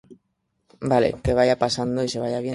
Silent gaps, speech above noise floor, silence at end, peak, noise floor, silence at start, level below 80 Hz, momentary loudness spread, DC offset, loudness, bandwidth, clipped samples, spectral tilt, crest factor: none; 52 dB; 0 s; -4 dBFS; -73 dBFS; 0.1 s; -42 dBFS; 6 LU; under 0.1%; -22 LUFS; 11.5 kHz; under 0.1%; -5.5 dB/octave; 18 dB